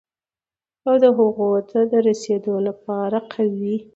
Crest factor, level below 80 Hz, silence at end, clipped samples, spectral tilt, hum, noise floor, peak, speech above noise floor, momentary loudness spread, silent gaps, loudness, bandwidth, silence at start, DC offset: 18 dB; -68 dBFS; 0.1 s; under 0.1%; -7 dB/octave; none; under -90 dBFS; -2 dBFS; over 71 dB; 9 LU; none; -20 LUFS; 8 kHz; 0.85 s; under 0.1%